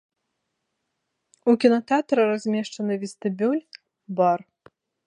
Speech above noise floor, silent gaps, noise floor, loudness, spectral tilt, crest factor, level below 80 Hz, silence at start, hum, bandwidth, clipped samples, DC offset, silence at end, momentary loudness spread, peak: 57 dB; none; -79 dBFS; -23 LUFS; -6 dB/octave; 20 dB; -78 dBFS; 1.45 s; none; 10.5 kHz; under 0.1%; under 0.1%; 0.7 s; 10 LU; -4 dBFS